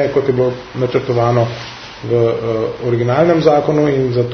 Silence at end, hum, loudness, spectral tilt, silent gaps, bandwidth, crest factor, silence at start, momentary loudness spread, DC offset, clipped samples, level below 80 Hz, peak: 0 s; none; -15 LUFS; -8 dB/octave; none; 6.6 kHz; 14 dB; 0 s; 8 LU; under 0.1%; under 0.1%; -46 dBFS; 0 dBFS